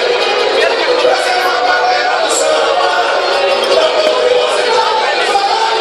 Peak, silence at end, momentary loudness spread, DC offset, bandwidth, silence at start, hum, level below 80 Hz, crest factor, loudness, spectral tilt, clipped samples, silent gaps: 0 dBFS; 0 s; 1 LU; under 0.1%; 14 kHz; 0 s; none; -54 dBFS; 12 dB; -11 LUFS; -0.5 dB/octave; under 0.1%; none